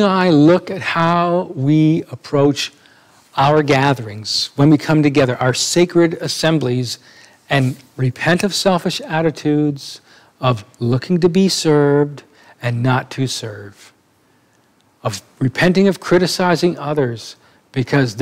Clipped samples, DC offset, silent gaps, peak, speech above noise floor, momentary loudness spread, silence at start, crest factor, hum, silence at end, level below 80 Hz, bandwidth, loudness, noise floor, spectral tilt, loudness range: under 0.1%; under 0.1%; none; 0 dBFS; 41 dB; 12 LU; 0 s; 16 dB; none; 0 s; -52 dBFS; 16 kHz; -16 LUFS; -56 dBFS; -5.5 dB/octave; 4 LU